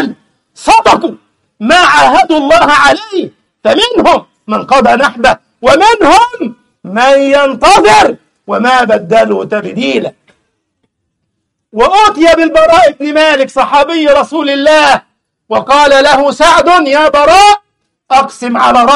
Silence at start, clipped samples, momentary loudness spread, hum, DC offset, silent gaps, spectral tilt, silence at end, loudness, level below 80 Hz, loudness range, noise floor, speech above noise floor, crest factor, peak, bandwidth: 0 s; 0.8%; 11 LU; none; under 0.1%; none; -3 dB/octave; 0 s; -7 LUFS; -36 dBFS; 4 LU; -67 dBFS; 60 dB; 8 dB; 0 dBFS; 13.5 kHz